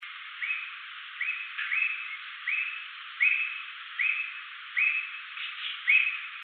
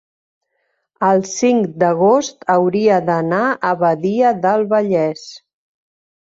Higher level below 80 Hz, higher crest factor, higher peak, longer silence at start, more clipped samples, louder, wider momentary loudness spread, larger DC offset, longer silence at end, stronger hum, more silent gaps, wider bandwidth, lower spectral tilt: second, under -90 dBFS vs -64 dBFS; first, 20 dB vs 14 dB; second, -12 dBFS vs -2 dBFS; second, 0 s vs 1 s; neither; second, -28 LUFS vs -16 LUFS; first, 15 LU vs 4 LU; neither; second, 0 s vs 0.95 s; neither; neither; second, 4.6 kHz vs 7.8 kHz; second, 14 dB/octave vs -5.5 dB/octave